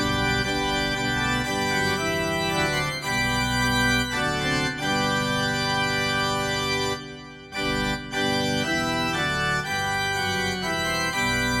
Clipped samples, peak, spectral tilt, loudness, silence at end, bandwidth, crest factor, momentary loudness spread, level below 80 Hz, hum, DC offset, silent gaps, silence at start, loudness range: under 0.1%; -10 dBFS; -3.5 dB/octave; -24 LUFS; 0 s; 17 kHz; 14 dB; 3 LU; -42 dBFS; none; under 0.1%; none; 0 s; 2 LU